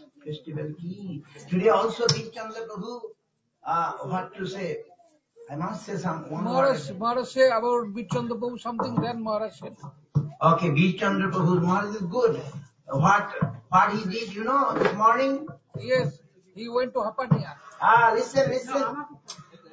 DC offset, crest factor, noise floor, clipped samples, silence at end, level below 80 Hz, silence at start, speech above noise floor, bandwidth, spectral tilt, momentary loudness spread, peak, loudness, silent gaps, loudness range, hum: under 0.1%; 20 dB; -58 dBFS; under 0.1%; 0.3 s; -62 dBFS; 0.25 s; 33 dB; 8 kHz; -6 dB/octave; 17 LU; -6 dBFS; -25 LUFS; none; 6 LU; none